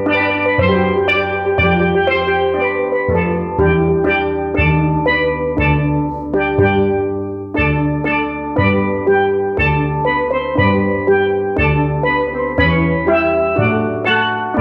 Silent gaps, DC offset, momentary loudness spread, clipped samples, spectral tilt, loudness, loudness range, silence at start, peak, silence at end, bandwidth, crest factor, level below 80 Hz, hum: none; under 0.1%; 4 LU; under 0.1%; -9 dB/octave; -15 LUFS; 1 LU; 0 s; 0 dBFS; 0 s; 5.6 kHz; 14 dB; -32 dBFS; none